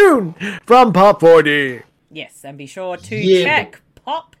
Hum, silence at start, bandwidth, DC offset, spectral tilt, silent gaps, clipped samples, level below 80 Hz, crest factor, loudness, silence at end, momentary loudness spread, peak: none; 0 s; 14 kHz; under 0.1%; -5.5 dB/octave; none; under 0.1%; -54 dBFS; 12 dB; -12 LUFS; 0.2 s; 23 LU; -2 dBFS